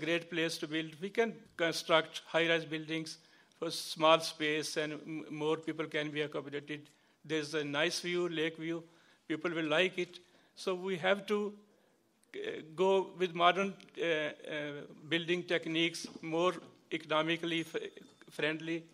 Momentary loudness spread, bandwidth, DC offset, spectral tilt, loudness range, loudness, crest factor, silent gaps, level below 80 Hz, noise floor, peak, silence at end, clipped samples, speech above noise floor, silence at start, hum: 12 LU; 15.5 kHz; under 0.1%; -4 dB/octave; 4 LU; -34 LUFS; 24 dB; none; -86 dBFS; -71 dBFS; -12 dBFS; 0.1 s; under 0.1%; 36 dB; 0 s; none